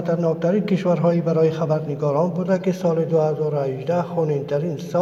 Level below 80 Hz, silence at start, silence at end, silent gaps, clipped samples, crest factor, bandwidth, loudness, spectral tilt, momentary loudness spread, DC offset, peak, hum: -66 dBFS; 0 s; 0 s; none; under 0.1%; 14 dB; 12 kHz; -21 LUFS; -8.5 dB/octave; 4 LU; under 0.1%; -6 dBFS; none